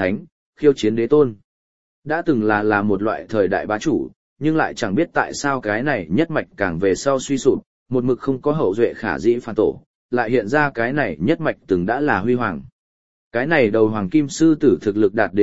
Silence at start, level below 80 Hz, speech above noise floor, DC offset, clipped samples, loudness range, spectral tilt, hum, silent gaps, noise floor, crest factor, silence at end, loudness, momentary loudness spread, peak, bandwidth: 0 s; -50 dBFS; over 72 dB; 0.8%; under 0.1%; 2 LU; -6 dB/octave; none; 0.32-0.53 s, 1.44-2.02 s, 4.16-4.36 s, 7.66-7.86 s, 9.86-10.09 s, 12.72-13.31 s; under -90 dBFS; 18 dB; 0 s; -19 LUFS; 7 LU; -2 dBFS; 8 kHz